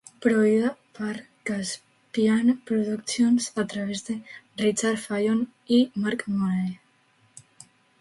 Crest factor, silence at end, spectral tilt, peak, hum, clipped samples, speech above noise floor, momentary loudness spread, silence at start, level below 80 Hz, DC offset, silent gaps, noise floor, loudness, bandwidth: 18 dB; 0.6 s; -5 dB/octave; -8 dBFS; none; under 0.1%; 39 dB; 12 LU; 0.2 s; -68 dBFS; under 0.1%; none; -63 dBFS; -25 LUFS; 11.5 kHz